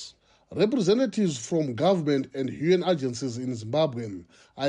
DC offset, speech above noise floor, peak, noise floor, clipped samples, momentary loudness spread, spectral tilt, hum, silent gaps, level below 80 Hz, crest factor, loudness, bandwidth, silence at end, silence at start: under 0.1%; 23 dB; -10 dBFS; -48 dBFS; under 0.1%; 13 LU; -6 dB/octave; none; none; -66 dBFS; 16 dB; -26 LUFS; 10.5 kHz; 0 s; 0 s